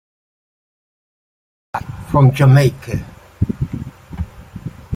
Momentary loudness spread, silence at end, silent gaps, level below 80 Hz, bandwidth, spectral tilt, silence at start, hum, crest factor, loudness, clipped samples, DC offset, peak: 21 LU; 0 s; none; -38 dBFS; 15 kHz; -8 dB/octave; 1.75 s; none; 16 dB; -16 LUFS; under 0.1%; under 0.1%; -2 dBFS